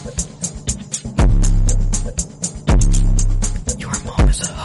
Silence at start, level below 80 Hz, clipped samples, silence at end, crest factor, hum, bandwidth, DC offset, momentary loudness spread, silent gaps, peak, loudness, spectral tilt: 0 s; -16 dBFS; under 0.1%; 0 s; 10 dB; none; 11.5 kHz; under 0.1%; 8 LU; none; -4 dBFS; -19 LUFS; -4.5 dB/octave